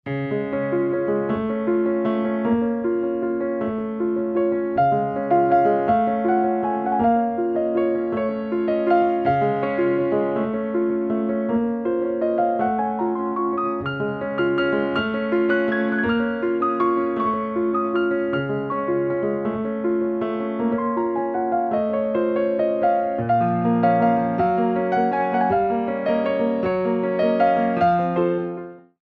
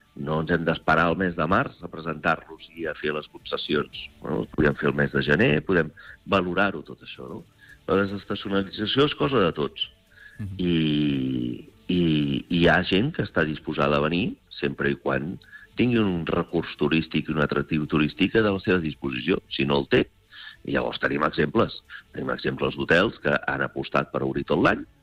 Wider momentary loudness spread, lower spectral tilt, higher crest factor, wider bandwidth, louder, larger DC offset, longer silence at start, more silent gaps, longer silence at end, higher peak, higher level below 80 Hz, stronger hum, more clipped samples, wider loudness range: second, 5 LU vs 12 LU; first, -9.5 dB/octave vs -7.5 dB/octave; about the same, 14 dB vs 16 dB; second, 4.8 kHz vs 10 kHz; about the same, -22 LUFS vs -24 LUFS; neither; about the same, 0.05 s vs 0.15 s; neither; about the same, 0.25 s vs 0.15 s; about the same, -6 dBFS vs -8 dBFS; second, -56 dBFS vs -48 dBFS; neither; neither; about the same, 3 LU vs 3 LU